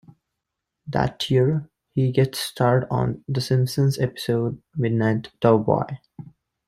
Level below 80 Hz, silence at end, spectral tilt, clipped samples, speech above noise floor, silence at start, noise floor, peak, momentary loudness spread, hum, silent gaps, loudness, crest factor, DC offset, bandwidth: -52 dBFS; 0.4 s; -6.5 dB/octave; under 0.1%; 61 dB; 0.85 s; -82 dBFS; -4 dBFS; 8 LU; none; none; -23 LUFS; 20 dB; under 0.1%; 15.5 kHz